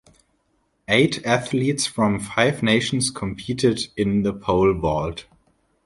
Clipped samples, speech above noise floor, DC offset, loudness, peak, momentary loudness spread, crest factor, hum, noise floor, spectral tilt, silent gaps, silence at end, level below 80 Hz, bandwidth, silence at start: under 0.1%; 47 dB; under 0.1%; -21 LUFS; -2 dBFS; 8 LU; 20 dB; none; -68 dBFS; -4.5 dB/octave; none; 0.65 s; -44 dBFS; 11.5 kHz; 0.9 s